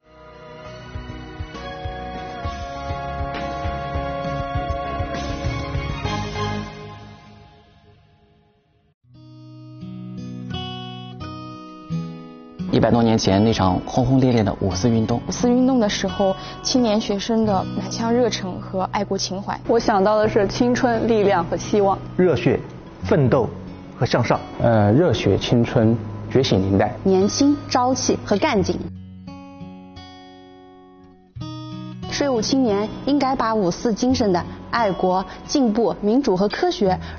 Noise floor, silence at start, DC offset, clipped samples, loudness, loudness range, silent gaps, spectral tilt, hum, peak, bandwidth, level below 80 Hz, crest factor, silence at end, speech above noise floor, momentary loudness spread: -60 dBFS; 0.2 s; under 0.1%; under 0.1%; -20 LUFS; 14 LU; 8.94-9.01 s; -5.5 dB/octave; none; -4 dBFS; 7 kHz; -40 dBFS; 16 dB; 0 s; 41 dB; 18 LU